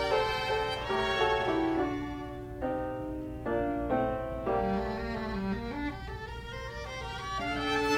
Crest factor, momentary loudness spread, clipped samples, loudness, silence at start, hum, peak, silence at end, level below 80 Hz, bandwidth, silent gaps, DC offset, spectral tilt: 16 dB; 11 LU; under 0.1%; -33 LUFS; 0 s; none; -16 dBFS; 0 s; -46 dBFS; 17 kHz; none; under 0.1%; -5.5 dB/octave